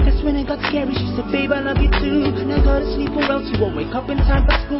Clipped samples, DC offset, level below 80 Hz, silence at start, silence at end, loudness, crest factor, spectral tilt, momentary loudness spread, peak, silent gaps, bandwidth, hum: under 0.1%; under 0.1%; -20 dBFS; 0 s; 0 s; -19 LUFS; 12 dB; -11 dB/octave; 4 LU; -4 dBFS; none; 5.8 kHz; none